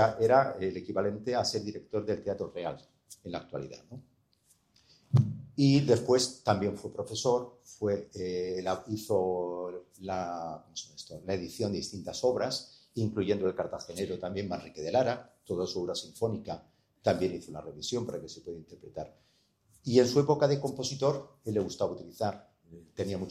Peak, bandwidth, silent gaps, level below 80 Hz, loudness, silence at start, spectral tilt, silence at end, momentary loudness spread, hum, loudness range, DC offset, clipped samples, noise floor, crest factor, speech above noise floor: -10 dBFS; 15 kHz; none; -66 dBFS; -31 LUFS; 0 s; -5.5 dB/octave; 0 s; 17 LU; none; 7 LU; under 0.1%; under 0.1%; -69 dBFS; 22 dB; 38 dB